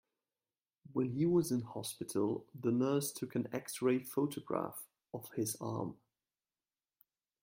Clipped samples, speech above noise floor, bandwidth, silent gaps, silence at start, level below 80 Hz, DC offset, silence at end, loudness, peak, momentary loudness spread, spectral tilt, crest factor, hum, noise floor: under 0.1%; over 54 dB; 16.5 kHz; none; 0.9 s; -76 dBFS; under 0.1%; 1.5 s; -37 LUFS; -18 dBFS; 11 LU; -6 dB/octave; 20 dB; none; under -90 dBFS